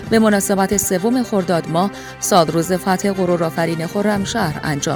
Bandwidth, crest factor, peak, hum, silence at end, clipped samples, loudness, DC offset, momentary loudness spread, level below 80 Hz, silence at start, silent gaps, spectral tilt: over 20 kHz; 18 dB; 0 dBFS; none; 0 s; under 0.1%; -17 LUFS; under 0.1%; 6 LU; -46 dBFS; 0 s; none; -4.5 dB/octave